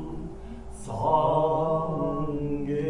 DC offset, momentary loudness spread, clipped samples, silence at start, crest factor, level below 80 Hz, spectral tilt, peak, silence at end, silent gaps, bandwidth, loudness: under 0.1%; 18 LU; under 0.1%; 0 s; 18 dB; -44 dBFS; -8 dB/octave; -10 dBFS; 0 s; none; 11.5 kHz; -26 LUFS